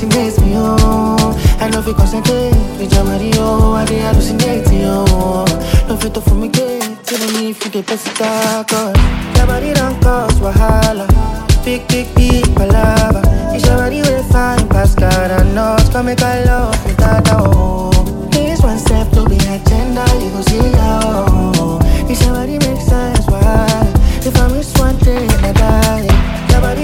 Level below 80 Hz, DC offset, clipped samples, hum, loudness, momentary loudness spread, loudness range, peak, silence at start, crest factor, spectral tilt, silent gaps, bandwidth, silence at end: -14 dBFS; under 0.1%; under 0.1%; none; -13 LUFS; 4 LU; 2 LU; 0 dBFS; 0 s; 10 dB; -5.5 dB/octave; none; 17 kHz; 0 s